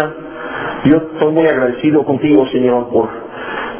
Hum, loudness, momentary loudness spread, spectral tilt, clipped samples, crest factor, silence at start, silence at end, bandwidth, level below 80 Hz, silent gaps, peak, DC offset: none; -14 LUFS; 12 LU; -11 dB/octave; under 0.1%; 14 dB; 0 s; 0 s; 3.6 kHz; -48 dBFS; none; 0 dBFS; under 0.1%